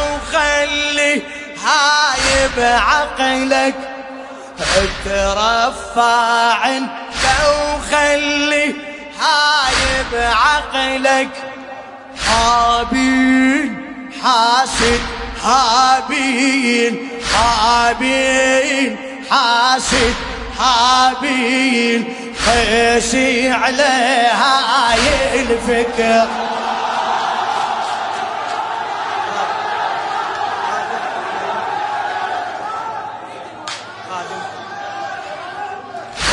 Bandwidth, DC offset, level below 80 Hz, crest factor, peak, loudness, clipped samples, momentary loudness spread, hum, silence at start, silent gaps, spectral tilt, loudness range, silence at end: 11 kHz; under 0.1%; -36 dBFS; 16 dB; 0 dBFS; -15 LUFS; under 0.1%; 15 LU; none; 0 s; none; -2.5 dB/octave; 7 LU; 0 s